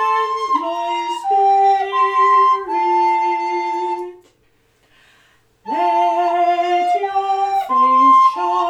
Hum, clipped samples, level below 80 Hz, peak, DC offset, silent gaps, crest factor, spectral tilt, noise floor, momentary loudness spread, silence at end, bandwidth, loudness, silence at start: 50 Hz at -70 dBFS; under 0.1%; -64 dBFS; -4 dBFS; under 0.1%; none; 12 dB; -3 dB/octave; -59 dBFS; 9 LU; 0 s; 9.6 kHz; -16 LUFS; 0 s